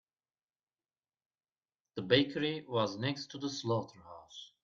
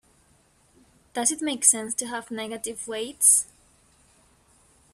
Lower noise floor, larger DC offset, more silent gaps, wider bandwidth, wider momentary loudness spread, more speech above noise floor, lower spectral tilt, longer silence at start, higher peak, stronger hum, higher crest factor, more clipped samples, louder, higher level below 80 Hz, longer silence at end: first, under -90 dBFS vs -62 dBFS; neither; neither; second, 7.4 kHz vs 15.5 kHz; first, 20 LU vs 16 LU; first, over 56 dB vs 37 dB; first, -5 dB/octave vs -0.5 dB/octave; first, 1.95 s vs 1.15 s; second, -12 dBFS vs -4 dBFS; neither; about the same, 26 dB vs 24 dB; neither; second, -34 LUFS vs -22 LUFS; second, -74 dBFS vs -68 dBFS; second, 0.2 s vs 1.5 s